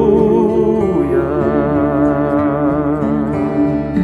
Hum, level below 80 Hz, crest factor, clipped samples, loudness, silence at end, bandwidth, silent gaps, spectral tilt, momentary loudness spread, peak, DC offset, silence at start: none; -34 dBFS; 12 dB; under 0.1%; -15 LUFS; 0 s; 6.4 kHz; none; -10 dB/octave; 4 LU; -2 dBFS; under 0.1%; 0 s